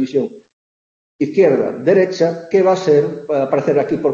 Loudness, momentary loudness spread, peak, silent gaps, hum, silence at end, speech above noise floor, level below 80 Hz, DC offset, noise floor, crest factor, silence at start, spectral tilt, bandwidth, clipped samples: -16 LUFS; 6 LU; -2 dBFS; 0.53-1.19 s; none; 0 s; over 75 dB; -62 dBFS; under 0.1%; under -90 dBFS; 14 dB; 0 s; -7 dB/octave; 7.4 kHz; under 0.1%